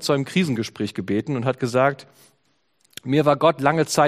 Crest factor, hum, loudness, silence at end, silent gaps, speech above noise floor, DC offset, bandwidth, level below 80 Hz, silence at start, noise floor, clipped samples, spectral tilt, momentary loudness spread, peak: 20 dB; none; -21 LUFS; 0 s; none; 47 dB; under 0.1%; 15.5 kHz; -62 dBFS; 0 s; -67 dBFS; under 0.1%; -5.5 dB/octave; 10 LU; -2 dBFS